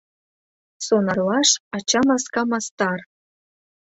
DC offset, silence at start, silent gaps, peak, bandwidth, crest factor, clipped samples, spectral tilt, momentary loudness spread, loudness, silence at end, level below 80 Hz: under 0.1%; 0.8 s; 1.60-1.71 s, 2.71-2.77 s; -4 dBFS; 8.4 kHz; 20 dB; under 0.1%; -3 dB/octave; 7 LU; -20 LUFS; 0.85 s; -62 dBFS